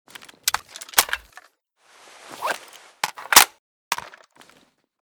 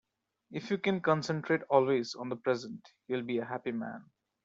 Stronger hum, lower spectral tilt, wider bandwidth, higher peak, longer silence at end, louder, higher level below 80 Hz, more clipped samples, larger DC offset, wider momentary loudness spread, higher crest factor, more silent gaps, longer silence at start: neither; second, 1.5 dB/octave vs -5 dB/octave; first, over 20 kHz vs 7.8 kHz; first, 0 dBFS vs -12 dBFS; first, 1.1 s vs 0.4 s; first, -21 LUFS vs -32 LUFS; first, -60 dBFS vs -76 dBFS; neither; neither; about the same, 17 LU vs 16 LU; about the same, 26 dB vs 22 dB; first, 3.59-3.91 s vs none; about the same, 0.45 s vs 0.5 s